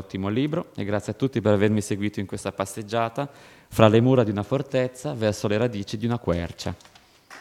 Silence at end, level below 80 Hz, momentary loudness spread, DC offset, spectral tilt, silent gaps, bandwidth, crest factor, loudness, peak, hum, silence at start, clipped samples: 0 s; -52 dBFS; 12 LU; under 0.1%; -6.5 dB/octave; none; 15.5 kHz; 24 dB; -24 LUFS; 0 dBFS; none; 0 s; under 0.1%